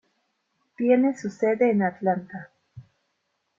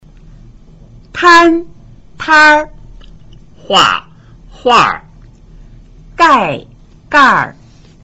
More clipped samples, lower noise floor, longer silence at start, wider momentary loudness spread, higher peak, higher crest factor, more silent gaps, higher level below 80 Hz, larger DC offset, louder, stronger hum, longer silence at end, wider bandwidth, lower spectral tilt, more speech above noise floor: neither; first, -75 dBFS vs -38 dBFS; second, 0.8 s vs 1.15 s; second, 12 LU vs 18 LU; second, -8 dBFS vs 0 dBFS; first, 18 dB vs 12 dB; neither; second, -72 dBFS vs -40 dBFS; neither; second, -23 LUFS vs -9 LUFS; neither; first, 0.8 s vs 0.5 s; about the same, 7.6 kHz vs 8.2 kHz; first, -8 dB/octave vs -3 dB/octave; first, 53 dB vs 30 dB